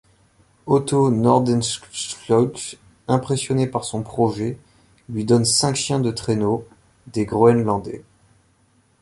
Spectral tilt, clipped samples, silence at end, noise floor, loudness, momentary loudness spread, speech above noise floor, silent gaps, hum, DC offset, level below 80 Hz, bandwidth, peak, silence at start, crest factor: -5.5 dB/octave; under 0.1%; 1 s; -60 dBFS; -20 LUFS; 15 LU; 40 dB; none; none; under 0.1%; -52 dBFS; 11.5 kHz; -2 dBFS; 0.65 s; 18 dB